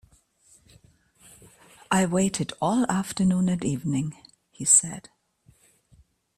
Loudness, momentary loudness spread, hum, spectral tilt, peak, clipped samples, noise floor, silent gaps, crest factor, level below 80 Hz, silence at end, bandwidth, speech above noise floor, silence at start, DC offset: -23 LUFS; 12 LU; none; -4 dB/octave; -2 dBFS; under 0.1%; -61 dBFS; none; 24 dB; -58 dBFS; 1.4 s; 13.5 kHz; 37 dB; 1.9 s; under 0.1%